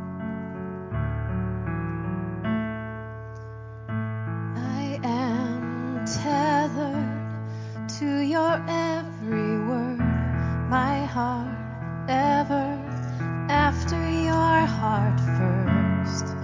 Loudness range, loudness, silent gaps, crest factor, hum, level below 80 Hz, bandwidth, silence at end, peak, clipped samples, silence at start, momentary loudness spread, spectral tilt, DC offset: 7 LU; -26 LUFS; none; 18 dB; none; -40 dBFS; 7.6 kHz; 0 s; -8 dBFS; under 0.1%; 0 s; 11 LU; -6.5 dB/octave; under 0.1%